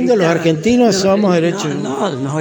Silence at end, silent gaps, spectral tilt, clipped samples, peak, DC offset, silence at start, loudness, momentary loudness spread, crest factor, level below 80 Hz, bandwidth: 0 s; none; -5.5 dB/octave; under 0.1%; -2 dBFS; under 0.1%; 0 s; -14 LUFS; 7 LU; 12 dB; -48 dBFS; 17 kHz